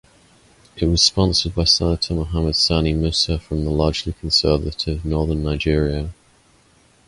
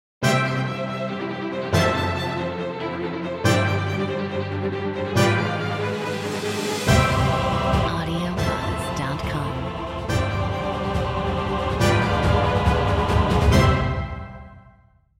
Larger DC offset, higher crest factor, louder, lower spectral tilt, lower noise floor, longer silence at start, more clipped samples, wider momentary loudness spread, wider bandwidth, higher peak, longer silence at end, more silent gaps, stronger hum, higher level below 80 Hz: neither; about the same, 18 dB vs 18 dB; first, -19 LUFS vs -23 LUFS; about the same, -4.5 dB/octave vs -5.5 dB/octave; about the same, -55 dBFS vs -55 dBFS; first, 0.75 s vs 0.2 s; neither; about the same, 8 LU vs 9 LU; second, 11.5 kHz vs 16 kHz; about the same, -2 dBFS vs -4 dBFS; first, 0.95 s vs 0.6 s; neither; neither; about the same, -30 dBFS vs -32 dBFS